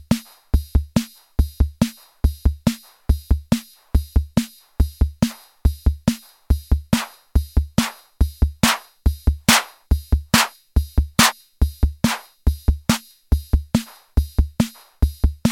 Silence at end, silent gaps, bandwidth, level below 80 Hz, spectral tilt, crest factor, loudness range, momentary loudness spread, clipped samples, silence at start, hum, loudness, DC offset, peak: 0 s; none; 17 kHz; -22 dBFS; -4.5 dB/octave; 20 dB; 4 LU; 8 LU; under 0.1%; 0.1 s; none; -22 LUFS; under 0.1%; 0 dBFS